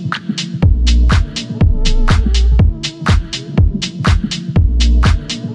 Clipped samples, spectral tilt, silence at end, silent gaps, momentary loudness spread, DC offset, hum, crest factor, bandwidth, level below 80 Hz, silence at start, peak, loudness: under 0.1%; -5.5 dB/octave; 0 s; none; 7 LU; under 0.1%; none; 12 dB; 9.6 kHz; -14 dBFS; 0 s; 0 dBFS; -15 LUFS